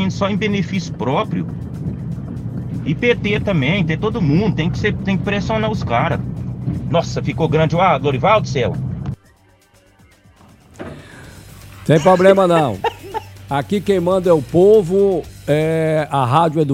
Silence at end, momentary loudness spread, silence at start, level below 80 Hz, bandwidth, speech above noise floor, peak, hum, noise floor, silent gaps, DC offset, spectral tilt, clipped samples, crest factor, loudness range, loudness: 0 s; 14 LU; 0 s; -40 dBFS; 15.5 kHz; 36 dB; 0 dBFS; none; -52 dBFS; none; under 0.1%; -7 dB/octave; under 0.1%; 18 dB; 6 LU; -17 LUFS